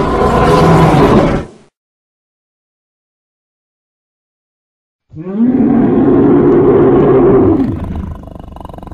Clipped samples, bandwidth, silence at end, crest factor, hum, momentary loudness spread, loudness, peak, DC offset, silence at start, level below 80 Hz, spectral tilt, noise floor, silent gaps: 0.2%; 13 kHz; 0.05 s; 12 dB; none; 19 LU; -9 LUFS; 0 dBFS; under 0.1%; 0 s; -28 dBFS; -8 dB/octave; -29 dBFS; 1.77-4.99 s